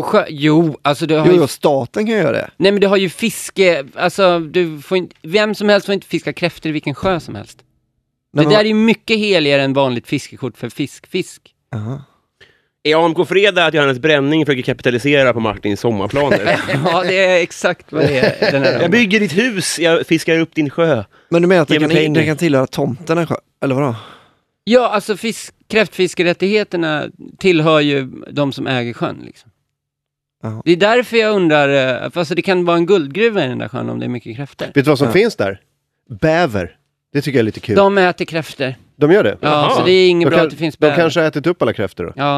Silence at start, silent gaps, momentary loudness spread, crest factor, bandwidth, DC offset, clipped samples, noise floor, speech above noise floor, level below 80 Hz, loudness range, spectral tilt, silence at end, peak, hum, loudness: 0 s; none; 11 LU; 14 dB; 14 kHz; under 0.1%; under 0.1%; -79 dBFS; 65 dB; -52 dBFS; 4 LU; -5.5 dB/octave; 0 s; 0 dBFS; none; -15 LUFS